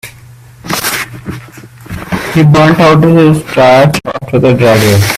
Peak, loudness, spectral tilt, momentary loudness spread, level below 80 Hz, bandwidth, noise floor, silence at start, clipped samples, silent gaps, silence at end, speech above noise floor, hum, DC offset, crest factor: 0 dBFS; -8 LUFS; -6 dB/octave; 19 LU; -36 dBFS; 16 kHz; -34 dBFS; 0.05 s; 0.1%; none; 0 s; 28 dB; none; under 0.1%; 8 dB